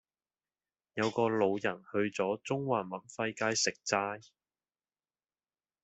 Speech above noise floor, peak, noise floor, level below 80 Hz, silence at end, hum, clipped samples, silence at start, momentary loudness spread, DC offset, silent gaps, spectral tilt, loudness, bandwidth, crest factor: over 57 dB; -12 dBFS; under -90 dBFS; -76 dBFS; 1.65 s; none; under 0.1%; 0.95 s; 8 LU; under 0.1%; none; -3.5 dB/octave; -33 LUFS; 8.2 kHz; 22 dB